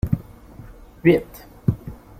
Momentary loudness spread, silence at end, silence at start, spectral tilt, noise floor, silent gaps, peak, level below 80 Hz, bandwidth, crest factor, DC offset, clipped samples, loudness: 25 LU; 0.25 s; 0.05 s; -8.5 dB/octave; -42 dBFS; none; -2 dBFS; -40 dBFS; 16 kHz; 22 dB; under 0.1%; under 0.1%; -22 LUFS